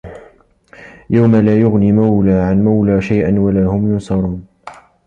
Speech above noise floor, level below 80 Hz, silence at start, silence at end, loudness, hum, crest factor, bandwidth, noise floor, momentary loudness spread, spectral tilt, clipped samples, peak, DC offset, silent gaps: 35 dB; -36 dBFS; 0.05 s; 0.35 s; -13 LUFS; none; 12 dB; 7.6 kHz; -47 dBFS; 7 LU; -10 dB/octave; under 0.1%; -2 dBFS; under 0.1%; none